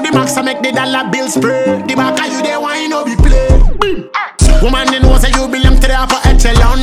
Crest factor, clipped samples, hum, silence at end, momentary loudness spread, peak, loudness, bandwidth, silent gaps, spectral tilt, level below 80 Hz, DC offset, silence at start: 10 dB; under 0.1%; none; 0 s; 5 LU; 0 dBFS; -12 LUFS; 14 kHz; none; -4.5 dB/octave; -12 dBFS; under 0.1%; 0 s